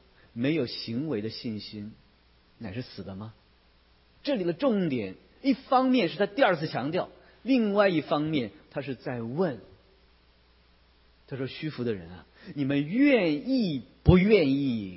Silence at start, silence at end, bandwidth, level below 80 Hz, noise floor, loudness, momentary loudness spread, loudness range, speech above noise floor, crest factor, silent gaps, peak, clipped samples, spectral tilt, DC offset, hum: 0.35 s; 0 s; 5.8 kHz; -48 dBFS; -61 dBFS; -27 LUFS; 18 LU; 11 LU; 35 dB; 22 dB; none; -6 dBFS; under 0.1%; -10.5 dB/octave; under 0.1%; none